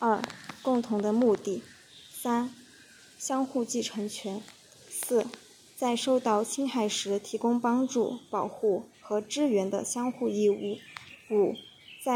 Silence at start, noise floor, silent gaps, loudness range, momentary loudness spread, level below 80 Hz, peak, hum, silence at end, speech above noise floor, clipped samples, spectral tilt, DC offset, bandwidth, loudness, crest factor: 0 s; -55 dBFS; none; 5 LU; 13 LU; -78 dBFS; -10 dBFS; none; 0 s; 26 dB; under 0.1%; -4 dB/octave; under 0.1%; over 20 kHz; -30 LUFS; 20 dB